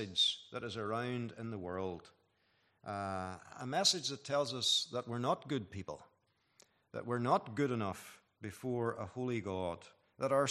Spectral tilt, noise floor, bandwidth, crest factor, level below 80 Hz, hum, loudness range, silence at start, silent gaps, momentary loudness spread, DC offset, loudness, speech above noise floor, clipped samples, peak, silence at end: -3.5 dB/octave; -77 dBFS; 14 kHz; 22 dB; -78 dBFS; none; 4 LU; 0 s; none; 17 LU; under 0.1%; -37 LUFS; 39 dB; under 0.1%; -16 dBFS; 0 s